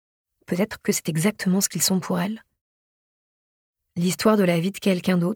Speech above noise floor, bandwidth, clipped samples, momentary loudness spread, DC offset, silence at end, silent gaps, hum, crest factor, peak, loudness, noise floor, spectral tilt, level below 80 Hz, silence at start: over 68 dB; 19 kHz; under 0.1%; 9 LU; under 0.1%; 0 s; 2.61-3.74 s; none; 18 dB; -6 dBFS; -23 LUFS; under -90 dBFS; -4.5 dB/octave; -64 dBFS; 0.5 s